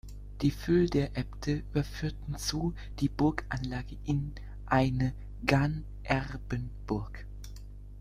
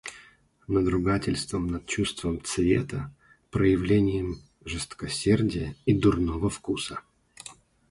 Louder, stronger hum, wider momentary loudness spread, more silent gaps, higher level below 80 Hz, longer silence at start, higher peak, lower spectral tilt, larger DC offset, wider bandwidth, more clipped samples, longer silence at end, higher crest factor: second, -32 LUFS vs -27 LUFS; first, 50 Hz at -40 dBFS vs none; about the same, 17 LU vs 17 LU; neither; about the same, -42 dBFS vs -44 dBFS; about the same, 0.05 s vs 0.05 s; first, -6 dBFS vs -10 dBFS; about the same, -6.5 dB/octave vs -6 dB/octave; neither; first, 15 kHz vs 11.5 kHz; neither; second, 0 s vs 0.35 s; first, 26 dB vs 18 dB